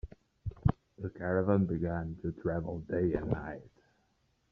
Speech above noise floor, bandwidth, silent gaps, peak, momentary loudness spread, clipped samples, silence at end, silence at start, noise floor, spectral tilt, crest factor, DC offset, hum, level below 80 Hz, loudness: 41 dB; 4.8 kHz; none; -12 dBFS; 15 LU; under 0.1%; 0.85 s; 0.05 s; -74 dBFS; -10 dB/octave; 22 dB; under 0.1%; none; -50 dBFS; -34 LUFS